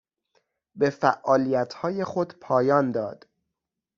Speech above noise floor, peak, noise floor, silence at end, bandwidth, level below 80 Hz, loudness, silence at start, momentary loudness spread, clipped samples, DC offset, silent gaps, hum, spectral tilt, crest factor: 61 dB; -4 dBFS; -85 dBFS; 0.8 s; 7.4 kHz; -68 dBFS; -24 LUFS; 0.75 s; 8 LU; under 0.1%; under 0.1%; none; none; -5.5 dB/octave; 22 dB